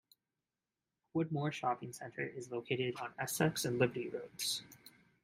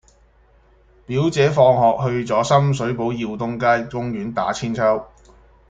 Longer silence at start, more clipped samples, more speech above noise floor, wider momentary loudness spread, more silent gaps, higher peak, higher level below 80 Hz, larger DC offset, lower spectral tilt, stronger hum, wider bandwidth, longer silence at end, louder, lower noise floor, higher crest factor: about the same, 1.15 s vs 1.1 s; neither; first, over 52 dB vs 35 dB; about the same, 10 LU vs 11 LU; neither; second, -16 dBFS vs -2 dBFS; second, -76 dBFS vs -50 dBFS; neither; second, -4.5 dB/octave vs -6.5 dB/octave; neither; first, 16 kHz vs 9.2 kHz; second, 0.35 s vs 0.65 s; second, -38 LUFS vs -19 LUFS; first, under -90 dBFS vs -54 dBFS; about the same, 22 dB vs 18 dB